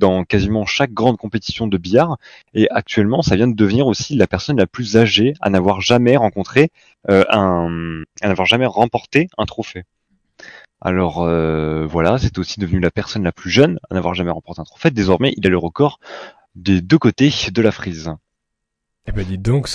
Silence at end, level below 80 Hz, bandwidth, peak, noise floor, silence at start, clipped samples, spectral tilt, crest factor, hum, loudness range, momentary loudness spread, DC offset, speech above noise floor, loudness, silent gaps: 0 s; -38 dBFS; 11 kHz; 0 dBFS; -77 dBFS; 0 s; 0.2%; -6 dB/octave; 16 dB; none; 4 LU; 12 LU; under 0.1%; 61 dB; -16 LUFS; none